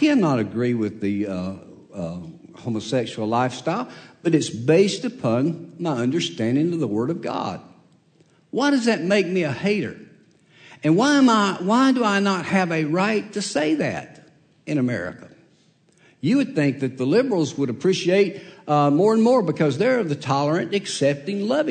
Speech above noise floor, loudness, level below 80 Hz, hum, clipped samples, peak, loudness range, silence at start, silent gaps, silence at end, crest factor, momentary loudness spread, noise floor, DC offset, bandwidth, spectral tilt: 38 dB; -21 LUFS; -66 dBFS; none; under 0.1%; -6 dBFS; 6 LU; 0 s; none; 0 s; 16 dB; 12 LU; -59 dBFS; under 0.1%; 9.4 kHz; -6 dB/octave